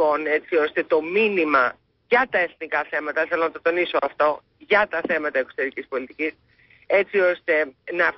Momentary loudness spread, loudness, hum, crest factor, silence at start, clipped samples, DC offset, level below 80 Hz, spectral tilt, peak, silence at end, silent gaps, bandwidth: 8 LU; -22 LUFS; none; 16 dB; 0 s; under 0.1%; under 0.1%; -64 dBFS; -8.5 dB/octave; -6 dBFS; 0 s; none; 5.8 kHz